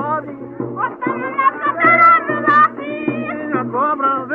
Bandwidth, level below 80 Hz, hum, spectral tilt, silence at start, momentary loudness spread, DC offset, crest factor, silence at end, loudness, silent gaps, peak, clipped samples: 5.6 kHz; -62 dBFS; none; -8 dB/octave; 0 s; 14 LU; under 0.1%; 14 dB; 0 s; -15 LUFS; none; -2 dBFS; under 0.1%